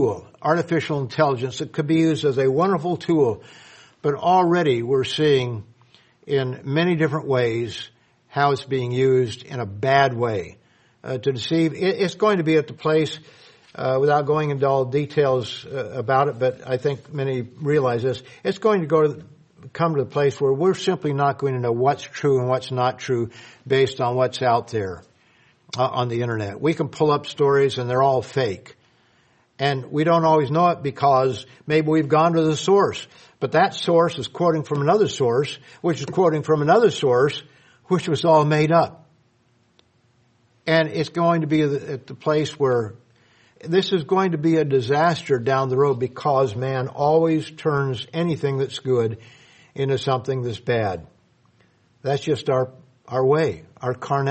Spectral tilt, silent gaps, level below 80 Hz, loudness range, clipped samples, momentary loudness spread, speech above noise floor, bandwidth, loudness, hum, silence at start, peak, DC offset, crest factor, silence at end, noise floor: -6.5 dB/octave; none; -62 dBFS; 4 LU; under 0.1%; 10 LU; 41 dB; 8.8 kHz; -21 LUFS; none; 0 s; -2 dBFS; under 0.1%; 20 dB; 0 s; -62 dBFS